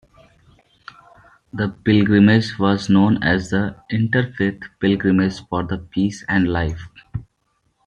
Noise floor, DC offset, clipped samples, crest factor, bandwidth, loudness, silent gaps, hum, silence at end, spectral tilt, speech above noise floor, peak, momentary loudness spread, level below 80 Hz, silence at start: -67 dBFS; under 0.1%; under 0.1%; 18 dB; 8.8 kHz; -19 LUFS; none; none; 0.65 s; -7 dB/octave; 49 dB; -2 dBFS; 12 LU; -46 dBFS; 1.55 s